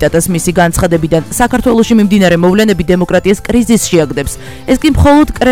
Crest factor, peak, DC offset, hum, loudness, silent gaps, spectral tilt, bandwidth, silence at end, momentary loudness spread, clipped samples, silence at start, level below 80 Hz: 10 dB; 0 dBFS; 2%; none; -10 LUFS; none; -5.5 dB/octave; 17 kHz; 0 s; 5 LU; 0.5%; 0 s; -24 dBFS